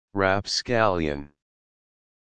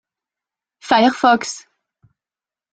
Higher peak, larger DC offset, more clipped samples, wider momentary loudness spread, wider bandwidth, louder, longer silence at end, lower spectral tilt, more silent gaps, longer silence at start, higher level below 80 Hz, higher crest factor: about the same, -4 dBFS vs -2 dBFS; neither; neither; second, 8 LU vs 20 LU; about the same, 10 kHz vs 9.2 kHz; second, -24 LUFS vs -15 LUFS; second, 0.95 s vs 1.15 s; first, -4.5 dB/octave vs -3 dB/octave; neither; second, 0.1 s vs 0.85 s; first, -50 dBFS vs -64 dBFS; about the same, 22 dB vs 18 dB